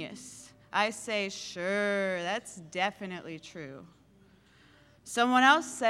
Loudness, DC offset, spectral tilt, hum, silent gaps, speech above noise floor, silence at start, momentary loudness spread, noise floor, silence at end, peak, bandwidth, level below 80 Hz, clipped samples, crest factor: -29 LUFS; under 0.1%; -3 dB/octave; none; none; 31 dB; 0 s; 22 LU; -61 dBFS; 0 s; -8 dBFS; 15 kHz; -72 dBFS; under 0.1%; 22 dB